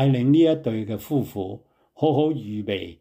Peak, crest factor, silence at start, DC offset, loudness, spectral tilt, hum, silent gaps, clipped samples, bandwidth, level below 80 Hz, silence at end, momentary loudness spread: -8 dBFS; 14 dB; 0 s; under 0.1%; -23 LUFS; -8.5 dB/octave; none; none; under 0.1%; 16 kHz; -62 dBFS; 0.05 s; 14 LU